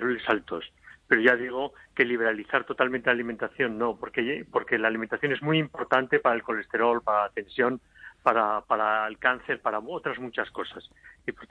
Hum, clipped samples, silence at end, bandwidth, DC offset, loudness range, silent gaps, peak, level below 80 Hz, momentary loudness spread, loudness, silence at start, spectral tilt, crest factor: none; under 0.1%; 0.05 s; 9.6 kHz; under 0.1%; 2 LU; none; -6 dBFS; -64 dBFS; 10 LU; -26 LUFS; 0 s; -7 dB/octave; 22 dB